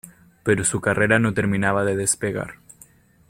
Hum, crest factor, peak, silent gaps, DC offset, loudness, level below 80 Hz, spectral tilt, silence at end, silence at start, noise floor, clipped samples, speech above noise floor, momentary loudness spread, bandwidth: none; 20 dB; -2 dBFS; none; under 0.1%; -21 LUFS; -52 dBFS; -4.5 dB/octave; 0.75 s; 0.05 s; -52 dBFS; under 0.1%; 31 dB; 10 LU; 16.5 kHz